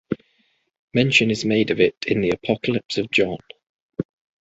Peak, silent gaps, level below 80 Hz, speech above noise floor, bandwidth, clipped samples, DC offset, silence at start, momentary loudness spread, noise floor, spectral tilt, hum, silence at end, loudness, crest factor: -4 dBFS; 0.79-0.88 s, 1.97-2.01 s, 3.69-3.89 s; -54 dBFS; 46 dB; 8 kHz; under 0.1%; under 0.1%; 0.1 s; 15 LU; -66 dBFS; -5 dB/octave; none; 0.4 s; -21 LUFS; 20 dB